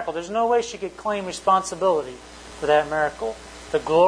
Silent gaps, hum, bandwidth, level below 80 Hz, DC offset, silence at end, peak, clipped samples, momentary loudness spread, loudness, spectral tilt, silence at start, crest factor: none; none; 10.5 kHz; -50 dBFS; under 0.1%; 0 s; -6 dBFS; under 0.1%; 13 LU; -23 LUFS; -4 dB/octave; 0 s; 16 dB